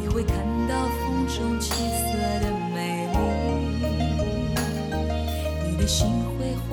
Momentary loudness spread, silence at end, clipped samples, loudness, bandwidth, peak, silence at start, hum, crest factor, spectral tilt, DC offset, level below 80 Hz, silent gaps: 4 LU; 0 s; under 0.1%; -26 LUFS; 17.5 kHz; -10 dBFS; 0 s; none; 14 dB; -5.5 dB/octave; under 0.1%; -30 dBFS; none